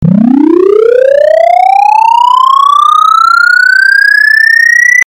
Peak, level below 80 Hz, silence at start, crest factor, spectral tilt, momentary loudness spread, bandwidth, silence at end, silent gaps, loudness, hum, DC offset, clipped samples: 0 dBFS; -46 dBFS; 0 s; 4 dB; -5 dB/octave; 3 LU; over 20 kHz; 0.05 s; none; -4 LUFS; none; under 0.1%; 10%